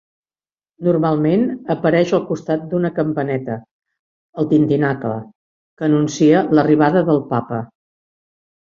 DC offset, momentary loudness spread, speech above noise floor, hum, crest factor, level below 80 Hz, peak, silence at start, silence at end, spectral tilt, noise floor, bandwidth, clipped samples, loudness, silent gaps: under 0.1%; 12 LU; over 74 dB; none; 16 dB; -58 dBFS; -2 dBFS; 0.8 s; 1 s; -7.5 dB/octave; under -90 dBFS; 7.4 kHz; under 0.1%; -17 LUFS; 3.71-3.80 s, 3.99-4.33 s, 5.35-5.77 s